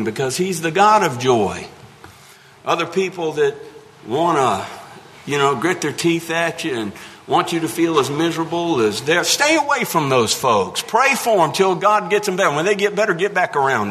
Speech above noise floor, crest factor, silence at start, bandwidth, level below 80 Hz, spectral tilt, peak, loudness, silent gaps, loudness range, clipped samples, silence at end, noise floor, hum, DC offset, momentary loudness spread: 28 dB; 18 dB; 0 s; 13.5 kHz; -60 dBFS; -4 dB/octave; -2 dBFS; -17 LUFS; none; 5 LU; under 0.1%; 0 s; -45 dBFS; none; under 0.1%; 9 LU